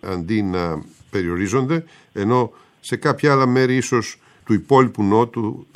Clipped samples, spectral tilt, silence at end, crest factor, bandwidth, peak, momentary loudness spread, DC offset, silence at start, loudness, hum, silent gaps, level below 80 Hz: under 0.1%; -6.5 dB/octave; 0.1 s; 18 dB; 14 kHz; -2 dBFS; 12 LU; under 0.1%; 0.05 s; -19 LUFS; none; none; -52 dBFS